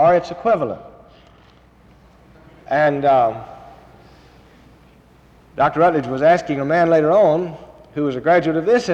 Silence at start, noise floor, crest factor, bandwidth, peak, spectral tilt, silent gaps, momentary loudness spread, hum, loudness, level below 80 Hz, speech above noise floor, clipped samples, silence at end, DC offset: 0 s; -49 dBFS; 14 dB; 8.4 kHz; -6 dBFS; -7 dB/octave; none; 17 LU; none; -17 LUFS; -52 dBFS; 33 dB; under 0.1%; 0 s; under 0.1%